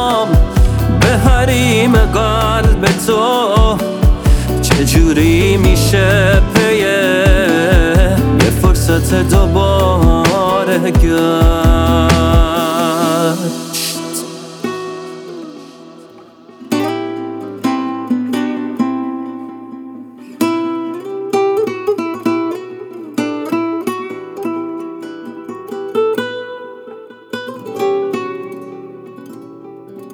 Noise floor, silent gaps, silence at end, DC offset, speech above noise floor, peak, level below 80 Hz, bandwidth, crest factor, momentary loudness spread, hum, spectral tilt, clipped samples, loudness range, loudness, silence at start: -39 dBFS; none; 0 s; under 0.1%; 29 dB; 0 dBFS; -18 dBFS; over 20 kHz; 14 dB; 18 LU; none; -5.5 dB/octave; under 0.1%; 12 LU; -13 LUFS; 0 s